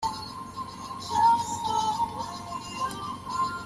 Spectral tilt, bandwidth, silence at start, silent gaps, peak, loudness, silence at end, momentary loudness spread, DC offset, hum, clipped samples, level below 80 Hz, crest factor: -3 dB/octave; 13.5 kHz; 0 s; none; -12 dBFS; -29 LUFS; 0 s; 15 LU; under 0.1%; none; under 0.1%; -56 dBFS; 16 dB